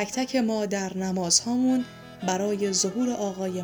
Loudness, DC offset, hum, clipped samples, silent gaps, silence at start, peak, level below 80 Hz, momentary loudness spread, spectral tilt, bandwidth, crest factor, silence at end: -25 LUFS; under 0.1%; none; under 0.1%; none; 0 s; -8 dBFS; -64 dBFS; 8 LU; -3.5 dB/octave; over 20 kHz; 18 dB; 0 s